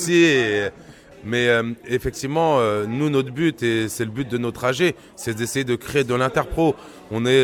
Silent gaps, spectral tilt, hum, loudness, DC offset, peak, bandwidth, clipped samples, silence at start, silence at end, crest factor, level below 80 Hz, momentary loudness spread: none; -5 dB/octave; none; -21 LUFS; under 0.1%; -4 dBFS; 18.5 kHz; under 0.1%; 0 s; 0 s; 16 dB; -46 dBFS; 8 LU